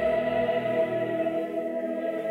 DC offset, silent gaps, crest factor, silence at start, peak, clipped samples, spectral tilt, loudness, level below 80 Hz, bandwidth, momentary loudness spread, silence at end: under 0.1%; none; 12 dB; 0 s; -14 dBFS; under 0.1%; -7 dB/octave; -28 LUFS; -58 dBFS; 11 kHz; 5 LU; 0 s